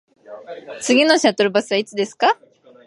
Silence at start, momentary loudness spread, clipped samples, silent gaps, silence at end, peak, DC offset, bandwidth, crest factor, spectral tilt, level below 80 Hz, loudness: 0.3 s; 20 LU; under 0.1%; none; 0.55 s; -2 dBFS; under 0.1%; 11.5 kHz; 18 dB; -3 dB/octave; -74 dBFS; -17 LUFS